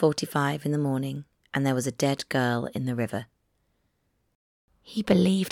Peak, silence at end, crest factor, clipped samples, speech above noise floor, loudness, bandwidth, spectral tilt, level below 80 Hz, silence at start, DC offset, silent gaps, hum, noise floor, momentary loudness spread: -8 dBFS; 0 s; 20 dB; under 0.1%; 47 dB; -27 LUFS; 16.5 kHz; -6 dB/octave; -62 dBFS; 0 s; under 0.1%; 4.35-4.68 s; none; -73 dBFS; 11 LU